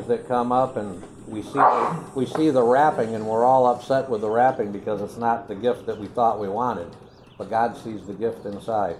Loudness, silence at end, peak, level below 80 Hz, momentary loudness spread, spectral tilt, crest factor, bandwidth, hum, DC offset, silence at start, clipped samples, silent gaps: -22 LUFS; 0 s; -4 dBFS; -58 dBFS; 15 LU; -6.5 dB/octave; 20 dB; 12.5 kHz; none; under 0.1%; 0 s; under 0.1%; none